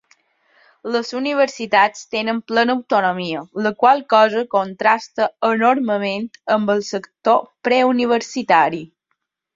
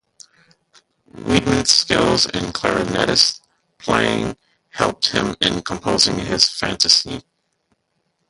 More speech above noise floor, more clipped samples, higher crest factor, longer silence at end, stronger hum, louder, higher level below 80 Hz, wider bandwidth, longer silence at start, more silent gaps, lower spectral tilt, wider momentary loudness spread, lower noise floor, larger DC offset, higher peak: first, 56 dB vs 52 dB; neither; about the same, 18 dB vs 20 dB; second, 0.7 s vs 1.1 s; neither; about the same, -18 LUFS vs -17 LUFS; second, -66 dBFS vs -44 dBFS; second, 7.8 kHz vs 11.5 kHz; second, 0.85 s vs 1.15 s; neither; first, -4.5 dB/octave vs -3 dB/octave; second, 8 LU vs 14 LU; first, -74 dBFS vs -70 dBFS; neither; about the same, -2 dBFS vs 0 dBFS